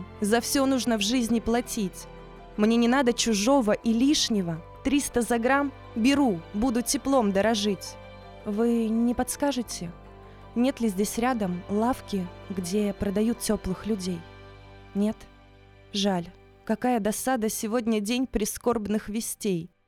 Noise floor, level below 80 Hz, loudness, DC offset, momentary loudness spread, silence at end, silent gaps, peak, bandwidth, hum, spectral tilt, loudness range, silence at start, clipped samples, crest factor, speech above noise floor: -52 dBFS; -48 dBFS; -26 LUFS; under 0.1%; 12 LU; 0.2 s; none; -8 dBFS; 17.5 kHz; none; -4.5 dB/octave; 6 LU; 0 s; under 0.1%; 18 dB; 27 dB